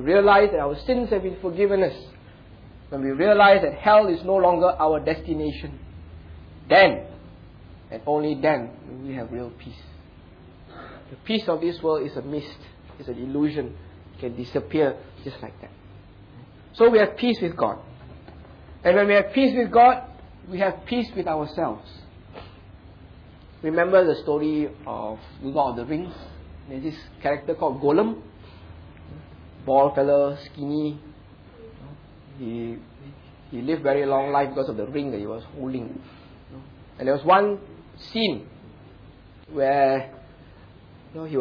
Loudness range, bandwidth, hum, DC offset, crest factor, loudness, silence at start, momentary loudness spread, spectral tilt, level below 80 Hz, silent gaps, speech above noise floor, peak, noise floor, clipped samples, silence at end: 9 LU; 5.4 kHz; none; under 0.1%; 20 dB; -22 LUFS; 0 s; 24 LU; -8 dB/octave; -48 dBFS; none; 26 dB; -4 dBFS; -48 dBFS; under 0.1%; 0 s